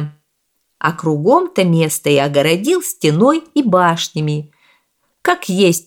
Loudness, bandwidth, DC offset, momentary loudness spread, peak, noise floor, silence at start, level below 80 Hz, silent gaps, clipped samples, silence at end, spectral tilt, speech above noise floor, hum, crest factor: -15 LUFS; 18.5 kHz; under 0.1%; 7 LU; 0 dBFS; -67 dBFS; 0 s; -62 dBFS; none; under 0.1%; 0.05 s; -5 dB/octave; 53 dB; none; 14 dB